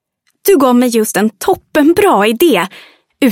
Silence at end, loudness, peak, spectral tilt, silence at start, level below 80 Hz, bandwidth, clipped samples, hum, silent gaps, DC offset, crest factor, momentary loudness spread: 0 s; -11 LUFS; 0 dBFS; -4 dB/octave; 0.45 s; -50 dBFS; 17 kHz; under 0.1%; none; none; under 0.1%; 12 dB; 7 LU